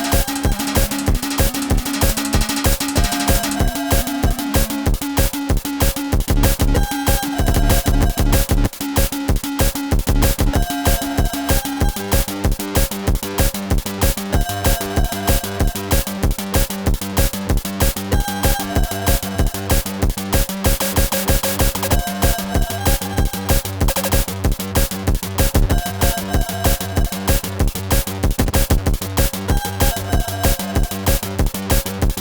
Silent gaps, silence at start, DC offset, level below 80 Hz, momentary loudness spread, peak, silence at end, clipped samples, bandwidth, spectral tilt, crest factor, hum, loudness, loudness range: none; 0 s; under 0.1%; -20 dBFS; 4 LU; 0 dBFS; 0 s; under 0.1%; over 20 kHz; -4.5 dB/octave; 16 dB; none; -19 LUFS; 1 LU